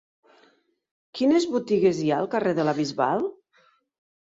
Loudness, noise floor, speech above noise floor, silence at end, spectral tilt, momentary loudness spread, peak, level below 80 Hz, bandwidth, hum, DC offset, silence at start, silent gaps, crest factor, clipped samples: -24 LUFS; -63 dBFS; 40 dB; 0.95 s; -6 dB/octave; 6 LU; -8 dBFS; -68 dBFS; 7.8 kHz; none; under 0.1%; 1.15 s; none; 18 dB; under 0.1%